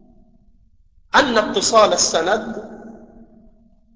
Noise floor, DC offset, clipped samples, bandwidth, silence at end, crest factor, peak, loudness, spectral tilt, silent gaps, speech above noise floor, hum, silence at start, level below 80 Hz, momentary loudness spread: -53 dBFS; 0.1%; under 0.1%; 8 kHz; 1 s; 18 dB; -2 dBFS; -16 LUFS; -1.5 dB/octave; none; 37 dB; none; 1.15 s; -50 dBFS; 20 LU